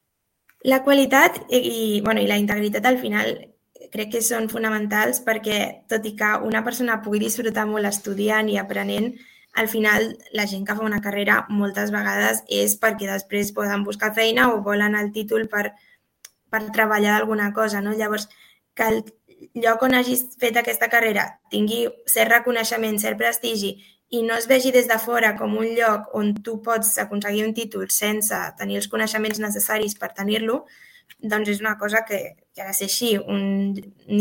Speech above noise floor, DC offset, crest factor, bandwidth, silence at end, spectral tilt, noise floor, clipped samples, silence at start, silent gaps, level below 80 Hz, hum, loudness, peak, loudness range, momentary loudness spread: 44 dB; under 0.1%; 22 dB; 17 kHz; 0 s; -3 dB/octave; -65 dBFS; under 0.1%; 0.65 s; none; -60 dBFS; none; -21 LUFS; 0 dBFS; 4 LU; 9 LU